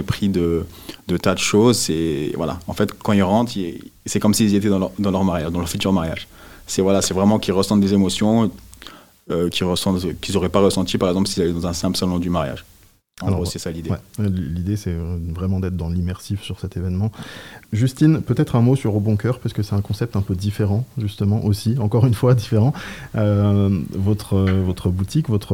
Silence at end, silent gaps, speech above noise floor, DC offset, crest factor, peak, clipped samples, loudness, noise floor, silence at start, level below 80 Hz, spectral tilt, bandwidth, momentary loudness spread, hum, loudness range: 0 s; none; 23 dB; 0.2%; 18 dB; 0 dBFS; under 0.1%; -20 LUFS; -42 dBFS; 0 s; -44 dBFS; -6 dB/octave; 17 kHz; 11 LU; none; 6 LU